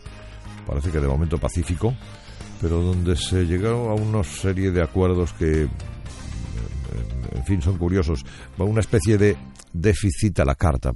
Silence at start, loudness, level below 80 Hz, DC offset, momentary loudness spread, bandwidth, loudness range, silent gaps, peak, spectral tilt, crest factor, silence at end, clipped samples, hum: 0.05 s; -23 LUFS; -32 dBFS; under 0.1%; 14 LU; 11.5 kHz; 4 LU; none; -4 dBFS; -6.5 dB/octave; 18 dB; 0 s; under 0.1%; none